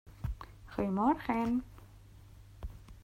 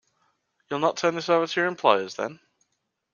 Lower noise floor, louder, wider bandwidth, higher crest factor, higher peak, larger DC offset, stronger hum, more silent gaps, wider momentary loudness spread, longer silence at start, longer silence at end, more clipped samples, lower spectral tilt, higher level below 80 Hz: second, -55 dBFS vs -78 dBFS; second, -34 LUFS vs -24 LUFS; first, 16 kHz vs 7.2 kHz; about the same, 18 dB vs 22 dB; second, -18 dBFS vs -4 dBFS; neither; neither; neither; first, 19 LU vs 11 LU; second, 0.05 s vs 0.7 s; second, 0 s vs 0.8 s; neither; first, -8 dB/octave vs -4 dB/octave; first, -50 dBFS vs -76 dBFS